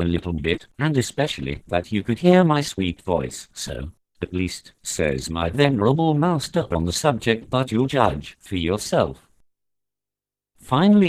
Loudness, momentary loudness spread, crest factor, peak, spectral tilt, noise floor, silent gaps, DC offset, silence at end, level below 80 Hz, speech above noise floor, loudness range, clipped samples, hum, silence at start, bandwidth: -22 LUFS; 13 LU; 18 dB; -4 dBFS; -5.5 dB/octave; -89 dBFS; none; under 0.1%; 0 s; -42 dBFS; 68 dB; 4 LU; under 0.1%; 50 Hz at -50 dBFS; 0 s; 15.5 kHz